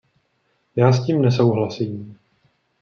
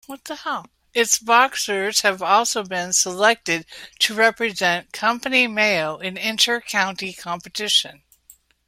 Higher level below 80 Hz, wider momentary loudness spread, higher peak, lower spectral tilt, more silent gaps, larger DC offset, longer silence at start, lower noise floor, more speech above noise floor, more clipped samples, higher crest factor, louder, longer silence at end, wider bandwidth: about the same, -62 dBFS vs -64 dBFS; first, 15 LU vs 12 LU; about the same, -2 dBFS vs -2 dBFS; first, -8 dB/octave vs -1 dB/octave; neither; neither; first, 0.75 s vs 0.1 s; first, -67 dBFS vs -53 dBFS; first, 49 dB vs 32 dB; neither; about the same, 18 dB vs 20 dB; about the same, -19 LUFS vs -19 LUFS; about the same, 0.7 s vs 0.75 s; second, 6.8 kHz vs 16.5 kHz